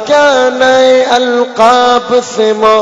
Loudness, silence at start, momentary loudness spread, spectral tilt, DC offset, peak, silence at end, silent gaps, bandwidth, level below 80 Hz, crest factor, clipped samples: -8 LUFS; 0 s; 5 LU; -2.5 dB/octave; under 0.1%; 0 dBFS; 0 s; none; 9.4 kHz; -50 dBFS; 8 dB; 1%